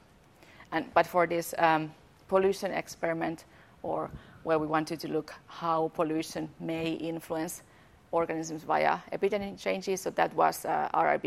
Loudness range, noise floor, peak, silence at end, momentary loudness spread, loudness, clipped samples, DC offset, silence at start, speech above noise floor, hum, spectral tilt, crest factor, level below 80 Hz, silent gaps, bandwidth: 4 LU; -58 dBFS; -8 dBFS; 0 s; 10 LU; -30 LUFS; under 0.1%; under 0.1%; 0.6 s; 28 dB; none; -5 dB/octave; 22 dB; -64 dBFS; none; 16 kHz